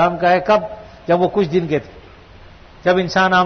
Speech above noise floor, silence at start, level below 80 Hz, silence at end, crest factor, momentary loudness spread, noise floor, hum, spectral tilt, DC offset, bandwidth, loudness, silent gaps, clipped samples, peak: 26 dB; 0 s; -46 dBFS; 0 s; 12 dB; 9 LU; -41 dBFS; none; -6 dB/octave; under 0.1%; 6.6 kHz; -17 LUFS; none; under 0.1%; -4 dBFS